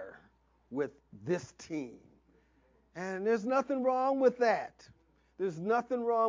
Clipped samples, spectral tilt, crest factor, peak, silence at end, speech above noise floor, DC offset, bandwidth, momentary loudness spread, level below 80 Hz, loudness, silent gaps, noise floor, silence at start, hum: under 0.1%; -6 dB/octave; 18 dB; -14 dBFS; 0 s; 37 dB; under 0.1%; 7.6 kHz; 17 LU; -72 dBFS; -33 LUFS; none; -68 dBFS; 0 s; none